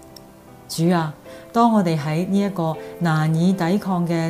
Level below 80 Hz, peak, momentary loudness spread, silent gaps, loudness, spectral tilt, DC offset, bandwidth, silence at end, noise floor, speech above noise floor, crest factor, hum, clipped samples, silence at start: -58 dBFS; -4 dBFS; 9 LU; none; -20 LUFS; -7 dB/octave; under 0.1%; 15.5 kHz; 0 s; -44 dBFS; 25 dB; 16 dB; none; under 0.1%; 0.05 s